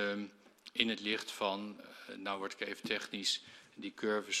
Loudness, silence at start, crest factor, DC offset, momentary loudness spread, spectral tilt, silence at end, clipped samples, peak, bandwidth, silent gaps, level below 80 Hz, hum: -37 LUFS; 0 s; 28 dB; under 0.1%; 16 LU; -2 dB/octave; 0 s; under 0.1%; -12 dBFS; 15 kHz; none; -80 dBFS; none